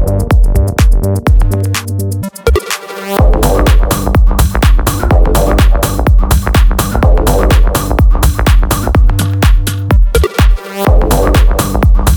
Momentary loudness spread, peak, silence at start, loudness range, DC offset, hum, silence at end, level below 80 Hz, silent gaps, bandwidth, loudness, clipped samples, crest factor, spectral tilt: 4 LU; 0 dBFS; 0 s; 2 LU; under 0.1%; none; 0 s; -10 dBFS; none; over 20 kHz; -11 LUFS; under 0.1%; 8 dB; -5.5 dB/octave